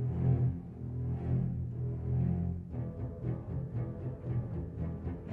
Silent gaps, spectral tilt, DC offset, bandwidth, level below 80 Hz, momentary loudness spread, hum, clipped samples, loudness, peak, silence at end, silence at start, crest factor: none; -12 dB/octave; under 0.1%; 2.8 kHz; -46 dBFS; 9 LU; none; under 0.1%; -36 LUFS; -18 dBFS; 0 s; 0 s; 16 dB